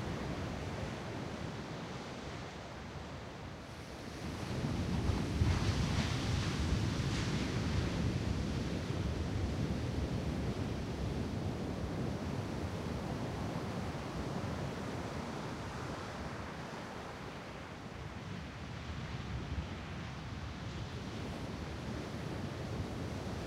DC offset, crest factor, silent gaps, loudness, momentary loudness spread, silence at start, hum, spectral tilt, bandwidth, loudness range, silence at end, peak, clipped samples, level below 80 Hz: under 0.1%; 20 dB; none; -40 LUFS; 10 LU; 0 s; none; -6 dB/octave; 15.5 kHz; 9 LU; 0 s; -18 dBFS; under 0.1%; -46 dBFS